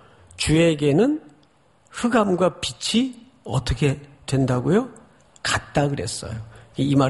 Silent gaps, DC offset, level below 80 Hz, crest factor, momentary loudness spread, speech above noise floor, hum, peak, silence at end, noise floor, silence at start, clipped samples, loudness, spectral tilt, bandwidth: none; under 0.1%; -42 dBFS; 18 dB; 14 LU; 38 dB; none; -4 dBFS; 0 s; -58 dBFS; 0.4 s; under 0.1%; -22 LUFS; -5.5 dB/octave; 11.5 kHz